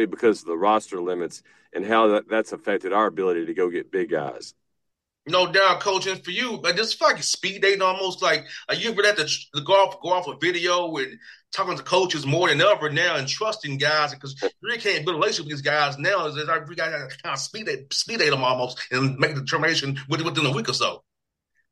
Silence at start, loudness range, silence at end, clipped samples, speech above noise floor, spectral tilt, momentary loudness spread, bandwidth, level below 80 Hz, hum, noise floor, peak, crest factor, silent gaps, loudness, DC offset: 0 s; 3 LU; 0.75 s; under 0.1%; 58 dB; -3.5 dB/octave; 9 LU; 12.5 kHz; -70 dBFS; none; -81 dBFS; -6 dBFS; 18 dB; none; -23 LUFS; under 0.1%